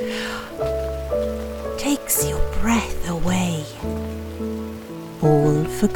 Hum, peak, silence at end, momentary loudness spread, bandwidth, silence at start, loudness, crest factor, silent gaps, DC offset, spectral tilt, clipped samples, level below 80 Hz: none; -4 dBFS; 0 s; 11 LU; 19.5 kHz; 0 s; -23 LUFS; 18 dB; none; under 0.1%; -5 dB/octave; under 0.1%; -32 dBFS